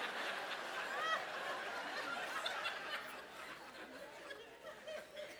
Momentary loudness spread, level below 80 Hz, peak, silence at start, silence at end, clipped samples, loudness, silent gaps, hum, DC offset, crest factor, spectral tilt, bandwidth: 12 LU; -82 dBFS; -24 dBFS; 0 s; 0 s; under 0.1%; -44 LUFS; none; none; under 0.1%; 20 dB; -1 dB/octave; over 20 kHz